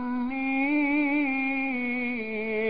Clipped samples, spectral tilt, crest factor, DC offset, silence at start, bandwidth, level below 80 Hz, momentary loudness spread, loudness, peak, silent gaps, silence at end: under 0.1%; -9 dB/octave; 10 dB; 0.5%; 0 s; 5 kHz; -60 dBFS; 6 LU; -26 LUFS; -16 dBFS; none; 0 s